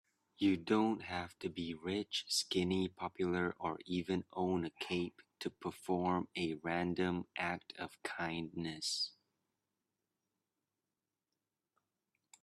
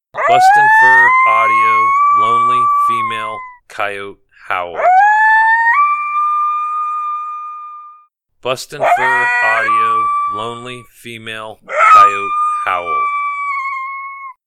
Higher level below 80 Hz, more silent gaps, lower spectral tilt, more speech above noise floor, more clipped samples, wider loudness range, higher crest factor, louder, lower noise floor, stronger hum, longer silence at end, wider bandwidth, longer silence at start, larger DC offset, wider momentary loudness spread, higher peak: second, -74 dBFS vs -56 dBFS; neither; first, -4.5 dB/octave vs -2.5 dB/octave; first, over 52 dB vs 37 dB; neither; about the same, 7 LU vs 6 LU; first, 20 dB vs 14 dB; second, -38 LUFS vs -12 LUFS; first, under -90 dBFS vs -49 dBFS; neither; first, 3.3 s vs 0.15 s; about the same, 13.5 kHz vs 14.5 kHz; first, 0.4 s vs 0.15 s; neither; second, 9 LU vs 20 LU; second, -20 dBFS vs 0 dBFS